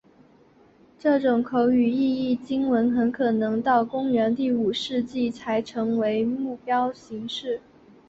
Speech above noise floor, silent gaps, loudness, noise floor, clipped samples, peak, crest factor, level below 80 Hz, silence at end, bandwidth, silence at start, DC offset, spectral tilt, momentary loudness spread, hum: 33 dB; none; -24 LUFS; -56 dBFS; under 0.1%; -8 dBFS; 16 dB; -62 dBFS; 0.5 s; 7.8 kHz; 1.05 s; under 0.1%; -6 dB/octave; 8 LU; none